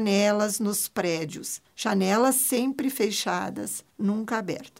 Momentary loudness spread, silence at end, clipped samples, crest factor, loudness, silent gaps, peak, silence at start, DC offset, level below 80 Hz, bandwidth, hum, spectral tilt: 11 LU; 0.1 s; under 0.1%; 16 dB; -26 LUFS; none; -10 dBFS; 0 s; under 0.1%; -72 dBFS; 16 kHz; none; -3.5 dB/octave